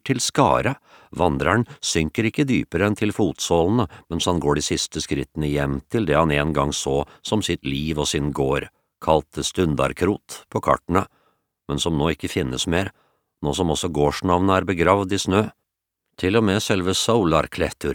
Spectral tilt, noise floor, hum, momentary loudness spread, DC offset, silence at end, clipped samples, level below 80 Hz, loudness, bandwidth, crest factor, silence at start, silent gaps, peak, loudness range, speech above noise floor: -5 dB/octave; -80 dBFS; none; 7 LU; under 0.1%; 0 s; under 0.1%; -40 dBFS; -22 LUFS; 19.5 kHz; 20 dB; 0.05 s; none; -2 dBFS; 3 LU; 59 dB